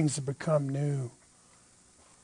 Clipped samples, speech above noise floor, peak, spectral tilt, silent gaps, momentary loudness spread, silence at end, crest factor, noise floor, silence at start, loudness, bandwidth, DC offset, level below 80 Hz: under 0.1%; 30 dB; -14 dBFS; -6.5 dB/octave; none; 7 LU; 1.15 s; 18 dB; -60 dBFS; 0 s; -31 LUFS; 10.5 kHz; under 0.1%; -70 dBFS